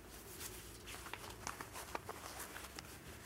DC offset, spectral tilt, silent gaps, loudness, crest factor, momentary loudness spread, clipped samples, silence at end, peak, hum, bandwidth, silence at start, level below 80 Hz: under 0.1%; -2.5 dB/octave; none; -49 LUFS; 28 dB; 4 LU; under 0.1%; 0 s; -22 dBFS; none; 16 kHz; 0 s; -62 dBFS